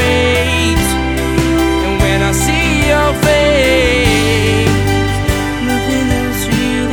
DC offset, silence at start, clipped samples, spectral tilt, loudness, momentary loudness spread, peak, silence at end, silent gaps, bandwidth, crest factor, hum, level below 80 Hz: under 0.1%; 0 s; under 0.1%; -4.5 dB/octave; -12 LUFS; 5 LU; 0 dBFS; 0 s; none; 19.5 kHz; 12 dB; none; -22 dBFS